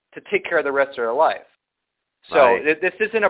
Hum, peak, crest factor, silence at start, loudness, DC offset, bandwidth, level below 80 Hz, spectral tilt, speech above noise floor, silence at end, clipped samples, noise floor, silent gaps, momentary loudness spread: none; -4 dBFS; 18 dB; 0.15 s; -19 LUFS; under 0.1%; 4 kHz; -64 dBFS; -8 dB/octave; 61 dB; 0 s; under 0.1%; -80 dBFS; none; 8 LU